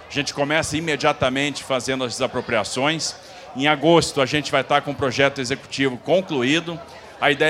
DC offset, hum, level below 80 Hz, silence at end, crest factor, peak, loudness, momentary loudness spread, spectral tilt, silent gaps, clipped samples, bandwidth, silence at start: under 0.1%; none; -52 dBFS; 0 s; 20 dB; 0 dBFS; -21 LUFS; 8 LU; -4 dB/octave; none; under 0.1%; 15.5 kHz; 0 s